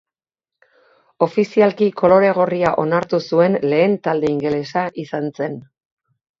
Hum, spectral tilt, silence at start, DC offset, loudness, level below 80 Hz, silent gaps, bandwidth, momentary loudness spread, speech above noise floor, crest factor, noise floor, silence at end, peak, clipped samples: none; -7.5 dB/octave; 1.2 s; under 0.1%; -17 LUFS; -58 dBFS; none; 7.6 kHz; 11 LU; 71 dB; 18 dB; -88 dBFS; 0.8 s; 0 dBFS; under 0.1%